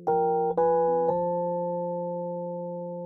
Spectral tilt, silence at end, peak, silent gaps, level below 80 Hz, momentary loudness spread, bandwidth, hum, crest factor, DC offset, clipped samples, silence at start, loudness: -12 dB/octave; 0 s; -14 dBFS; none; -66 dBFS; 10 LU; 2 kHz; none; 14 dB; under 0.1%; under 0.1%; 0 s; -27 LUFS